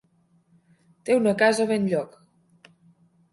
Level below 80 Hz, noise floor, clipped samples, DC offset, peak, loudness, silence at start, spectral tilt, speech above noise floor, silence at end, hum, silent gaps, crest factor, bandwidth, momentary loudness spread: -70 dBFS; -64 dBFS; under 0.1%; under 0.1%; -6 dBFS; -22 LUFS; 1.05 s; -5 dB/octave; 42 dB; 1.25 s; none; none; 20 dB; 11.5 kHz; 16 LU